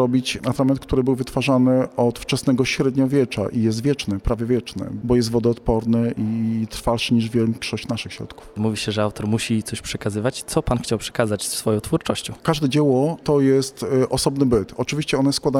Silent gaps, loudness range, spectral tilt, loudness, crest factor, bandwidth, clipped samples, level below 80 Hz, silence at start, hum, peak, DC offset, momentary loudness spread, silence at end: none; 4 LU; -5.5 dB/octave; -21 LUFS; 16 dB; 16 kHz; under 0.1%; -40 dBFS; 0 s; none; -4 dBFS; under 0.1%; 7 LU; 0 s